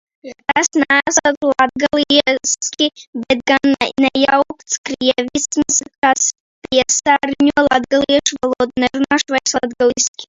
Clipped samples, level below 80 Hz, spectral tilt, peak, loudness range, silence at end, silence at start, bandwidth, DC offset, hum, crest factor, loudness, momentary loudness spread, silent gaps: under 0.1%; -50 dBFS; -1.5 dB/octave; 0 dBFS; 1 LU; 0.05 s; 0.25 s; 7.8 kHz; under 0.1%; none; 16 dB; -15 LUFS; 6 LU; 1.37-1.41 s, 3.07-3.13 s, 4.78-4.84 s, 5.98-6.02 s, 6.40-6.62 s, 10.08-10.14 s